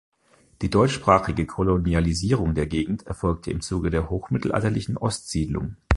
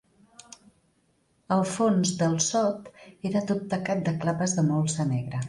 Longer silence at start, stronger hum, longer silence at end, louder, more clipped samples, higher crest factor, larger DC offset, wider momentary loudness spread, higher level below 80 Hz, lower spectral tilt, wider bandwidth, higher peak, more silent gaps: second, 0.6 s vs 1.5 s; neither; about the same, 0 s vs 0 s; about the same, -24 LUFS vs -26 LUFS; neither; about the same, 22 dB vs 18 dB; neither; first, 8 LU vs 5 LU; first, -34 dBFS vs -62 dBFS; about the same, -6.5 dB/octave vs -5.5 dB/octave; about the same, 11.5 kHz vs 11.5 kHz; first, -2 dBFS vs -10 dBFS; neither